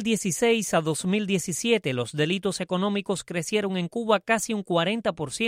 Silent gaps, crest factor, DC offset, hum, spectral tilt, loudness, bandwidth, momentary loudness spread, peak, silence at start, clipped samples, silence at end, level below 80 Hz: none; 18 dB; under 0.1%; none; -4 dB/octave; -25 LUFS; 16 kHz; 6 LU; -8 dBFS; 0 s; under 0.1%; 0 s; -62 dBFS